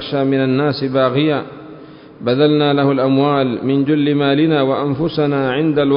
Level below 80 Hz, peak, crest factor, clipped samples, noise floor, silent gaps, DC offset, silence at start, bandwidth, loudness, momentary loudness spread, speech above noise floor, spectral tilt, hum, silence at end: -52 dBFS; -2 dBFS; 14 dB; under 0.1%; -37 dBFS; none; under 0.1%; 0 s; 5.4 kHz; -15 LUFS; 5 LU; 22 dB; -12 dB/octave; none; 0 s